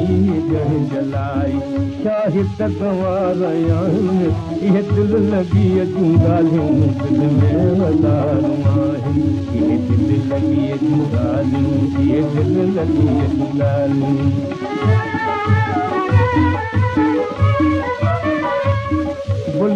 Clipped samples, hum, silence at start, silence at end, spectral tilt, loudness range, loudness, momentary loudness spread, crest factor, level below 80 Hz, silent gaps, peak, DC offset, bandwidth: under 0.1%; none; 0 s; 0 s; -9 dB/octave; 3 LU; -17 LUFS; 5 LU; 14 dB; -38 dBFS; none; -2 dBFS; under 0.1%; 7.4 kHz